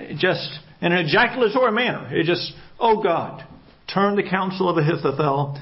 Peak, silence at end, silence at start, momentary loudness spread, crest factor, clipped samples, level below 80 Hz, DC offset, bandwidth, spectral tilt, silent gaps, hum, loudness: -6 dBFS; 0 s; 0 s; 9 LU; 16 dB; under 0.1%; -58 dBFS; under 0.1%; 5.8 kHz; -10 dB/octave; none; none; -21 LUFS